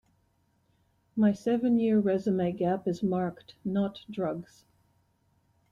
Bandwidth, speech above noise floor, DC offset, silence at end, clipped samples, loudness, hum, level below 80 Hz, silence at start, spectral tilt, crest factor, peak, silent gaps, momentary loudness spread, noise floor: 7.4 kHz; 43 dB; under 0.1%; 1.3 s; under 0.1%; -29 LUFS; none; -68 dBFS; 1.15 s; -8.5 dB/octave; 16 dB; -14 dBFS; none; 10 LU; -71 dBFS